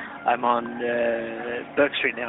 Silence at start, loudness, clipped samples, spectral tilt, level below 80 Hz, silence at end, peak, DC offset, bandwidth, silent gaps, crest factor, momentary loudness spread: 0 s; -25 LUFS; under 0.1%; -8.5 dB/octave; -64 dBFS; 0 s; -6 dBFS; under 0.1%; 4.1 kHz; none; 18 dB; 7 LU